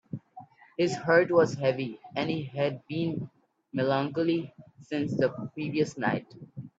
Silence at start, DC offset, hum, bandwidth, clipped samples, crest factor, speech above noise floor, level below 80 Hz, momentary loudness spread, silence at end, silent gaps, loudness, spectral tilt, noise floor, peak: 0.15 s; under 0.1%; none; 8 kHz; under 0.1%; 20 dB; 23 dB; -68 dBFS; 18 LU; 0.1 s; none; -29 LUFS; -6.5 dB/octave; -51 dBFS; -10 dBFS